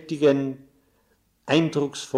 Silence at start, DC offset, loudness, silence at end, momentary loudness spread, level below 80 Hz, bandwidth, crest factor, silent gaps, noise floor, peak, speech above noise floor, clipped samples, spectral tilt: 0 s; under 0.1%; -23 LUFS; 0 s; 19 LU; -68 dBFS; 13 kHz; 16 dB; none; -66 dBFS; -8 dBFS; 43 dB; under 0.1%; -5.5 dB/octave